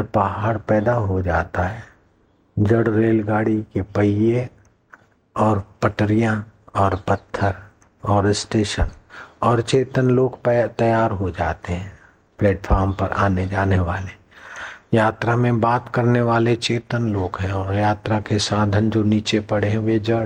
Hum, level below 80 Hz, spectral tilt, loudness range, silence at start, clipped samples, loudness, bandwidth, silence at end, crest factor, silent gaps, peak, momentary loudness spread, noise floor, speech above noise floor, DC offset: none; -38 dBFS; -6.5 dB/octave; 2 LU; 0 s; under 0.1%; -20 LUFS; 10 kHz; 0 s; 18 dB; none; -2 dBFS; 10 LU; -59 dBFS; 40 dB; under 0.1%